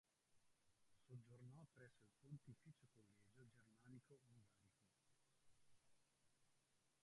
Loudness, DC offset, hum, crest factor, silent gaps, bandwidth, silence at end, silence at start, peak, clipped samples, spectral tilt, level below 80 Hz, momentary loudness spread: -66 LUFS; under 0.1%; none; 20 dB; none; 11 kHz; 0 s; 0.05 s; -48 dBFS; under 0.1%; -6.5 dB/octave; under -90 dBFS; 5 LU